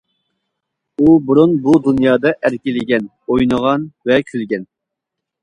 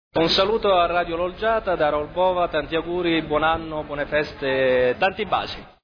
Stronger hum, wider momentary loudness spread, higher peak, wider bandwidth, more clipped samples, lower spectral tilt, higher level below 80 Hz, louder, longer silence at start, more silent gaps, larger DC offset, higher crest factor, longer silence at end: neither; first, 10 LU vs 7 LU; first, 0 dBFS vs -8 dBFS; first, 10 kHz vs 5.4 kHz; neither; first, -7.5 dB/octave vs -5.5 dB/octave; about the same, -48 dBFS vs -44 dBFS; first, -15 LUFS vs -22 LUFS; first, 1 s vs 0.15 s; neither; neither; about the same, 16 dB vs 14 dB; first, 0.8 s vs 0.15 s